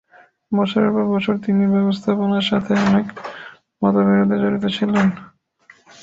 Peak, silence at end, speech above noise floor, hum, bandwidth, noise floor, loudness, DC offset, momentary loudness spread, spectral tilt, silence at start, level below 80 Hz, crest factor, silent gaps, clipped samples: -2 dBFS; 0.8 s; 35 dB; none; 7.6 kHz; -52 dBFS; -18 LUFS; under 0.1%; 9 LU; -7.5 dB/octave; 0.5 s; -56 dBFS; 16 dB; none; under 0.1%